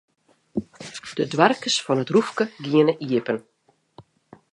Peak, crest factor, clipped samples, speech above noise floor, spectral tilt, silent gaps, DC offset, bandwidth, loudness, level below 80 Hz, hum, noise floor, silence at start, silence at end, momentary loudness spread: -2 dBFS; 22 dB; under 0.1%; 31 dB; -4.5 dB/octave; none; under 0.1%; 11 kHz; -22 LUFS; -64 dBFS; none; -52 dBFS; 0.55 s; 0.5 s; 13 LU